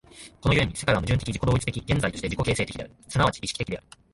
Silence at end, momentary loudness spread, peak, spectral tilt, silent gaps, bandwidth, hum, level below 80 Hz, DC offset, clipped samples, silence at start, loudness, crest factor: 0.35 s; 9 LU; -8 dBFS; -5 dB/octave; none; 11.5 kHz; none; -40 dBFS; under 0.1%; under 0.1%; 0.15 s; -26 LUFS; 18 dB